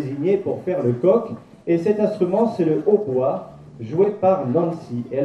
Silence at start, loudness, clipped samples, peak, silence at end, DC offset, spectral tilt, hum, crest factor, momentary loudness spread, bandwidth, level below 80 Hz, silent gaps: 0 s; -20 LUFS; under 0.1%; -4 dBFS; 0 s; under 0.1%; -9.5 dB/octave; none; 16 dB; 11 LU; 8.4 kHz; -62 dBFS; none